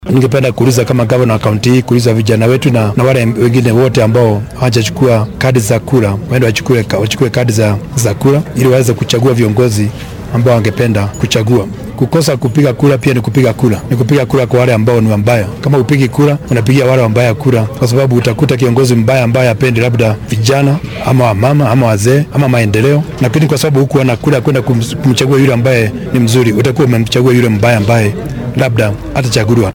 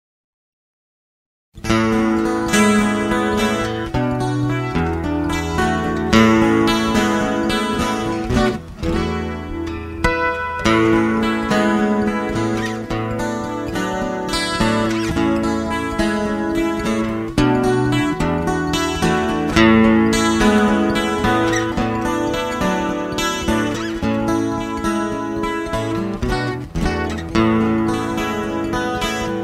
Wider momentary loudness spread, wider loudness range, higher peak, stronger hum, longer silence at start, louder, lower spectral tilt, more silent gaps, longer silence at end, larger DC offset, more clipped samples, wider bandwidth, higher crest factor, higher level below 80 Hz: second, 4 LU vs 8 LU; second, 2 LU vs 5 LU; about the same, 0 dBFS vs 0 dBFS; neither; second, 0 s vs 1.55 s; first, -10 LUFS vs -18 LUFS; about the same, -6.5 dB/octave vs -5.5 dB/octave; neither; about the same, 0 s vs 0 s; neither; neither; first, 18 kHz vs 15.5 kHz; second, 10 dB vs 18 dB; about the same, -36 dBFS vs -34 dBFS